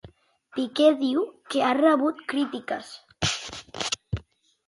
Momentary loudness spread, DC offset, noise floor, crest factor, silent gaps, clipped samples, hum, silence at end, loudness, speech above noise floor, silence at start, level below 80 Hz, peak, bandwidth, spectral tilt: 15 LU; under 0.1%; -55 dBFS; 20 dB; none; under 0.1%; none; 0.45 s; -25 LUFS; 31 dB; 0.05 s; -52 dBFS; -8 dBFS; 11.5 kHz; -4.5 dB/octave